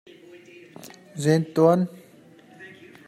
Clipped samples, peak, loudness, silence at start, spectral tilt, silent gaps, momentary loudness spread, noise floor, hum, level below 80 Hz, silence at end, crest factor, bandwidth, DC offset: under 0.1%; -6 dBFS; -22 LUFS; 0.85 s; -7 dB/octave; none; 25 LU; -51 dBFS; none; -72 dBFS; 0.4 s; 20 dB; 15.5 kHz; under 0.1%